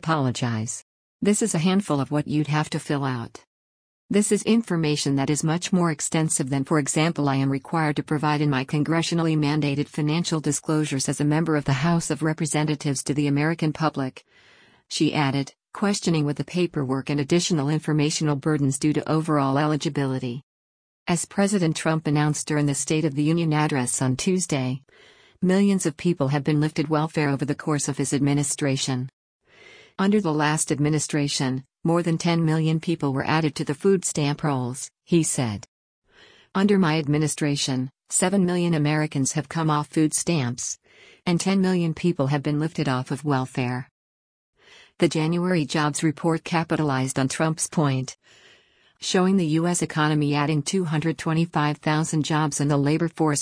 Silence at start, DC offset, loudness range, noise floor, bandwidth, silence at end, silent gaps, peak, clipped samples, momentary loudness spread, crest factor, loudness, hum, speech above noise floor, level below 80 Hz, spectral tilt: 0 s; under 0.1%; 2 LU; -58 dBFS; 10.5 kHz; 0 s; 0.82-1.19 s, 3.47-4.09 s, 20.43-21.06 s, 29.13-29.40 s, 35.68-36.02 s, 43.91-44.53 s; -6 dBFS; under 0.1%; 5 LU; 18 dB; -23 LUFS; none; 36 dB; -58 dBFS; -5 dB/octave